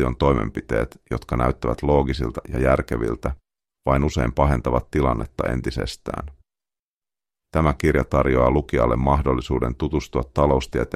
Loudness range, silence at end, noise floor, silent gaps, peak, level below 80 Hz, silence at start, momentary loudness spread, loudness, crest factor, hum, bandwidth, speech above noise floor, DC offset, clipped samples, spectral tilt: 4 LU; 0 s; under -90 dBFS; 6.79-7.01 s; -4 dBFS; -30 dBFS; 0 s; 9 LU; -22 LUFS; 18 dB; none; 14 kHz; over 69 dB; under 0.1%; under 0.1%; -7.5 dB/octave